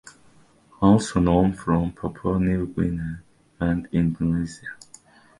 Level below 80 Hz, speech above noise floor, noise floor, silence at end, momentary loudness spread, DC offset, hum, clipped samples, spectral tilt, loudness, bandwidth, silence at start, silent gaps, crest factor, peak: -40 dBFS; 33 dB; -55 dBFS; 0.65 s; 15 LU; under 0.1%; none; under 0.1%; -7.5 dB/octave; -23 LUFS; 11.5 kHz; 0.05 s; none; 20 dB; -4 dBFS